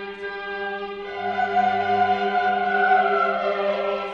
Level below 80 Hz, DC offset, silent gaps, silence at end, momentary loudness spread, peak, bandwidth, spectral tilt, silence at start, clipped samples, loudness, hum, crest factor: -60 dBFS; under 0.1%; none; 0 s; 12 LU; -8 dBFS; 7 kHz; -5.5 dB/octave; 0 s; under 0.1%; -22 LUFS; none; 16 dB